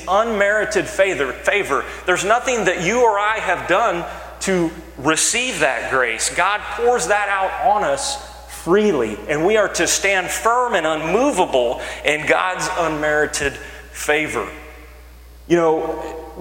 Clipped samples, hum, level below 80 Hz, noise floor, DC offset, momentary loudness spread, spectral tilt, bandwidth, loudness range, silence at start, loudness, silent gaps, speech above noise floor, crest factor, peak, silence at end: under 0.1%; none; -42 dBFS; -41 dBFS; under 0.1%; 8 LU; -3 dB/octave; 16.5 kHz; 3 LU; 0 s; -18 LUFS; none; 22 dB; 18 dB; 0 dBFS; 0 s